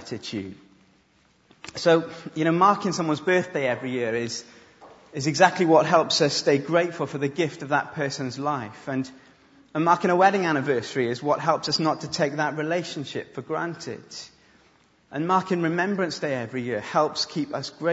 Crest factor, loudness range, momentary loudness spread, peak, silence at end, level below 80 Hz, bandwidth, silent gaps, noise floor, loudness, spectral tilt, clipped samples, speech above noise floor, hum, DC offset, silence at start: 24 dB; 6 LU; 14 LU; -2 dBFS; 0 s; -68 dBFS; 8 kHz; none; -62 dBFS; -24 LUFS; -4.5 dB/octave; under 0.1%; 38 dB; none; under 0.1%; 0 s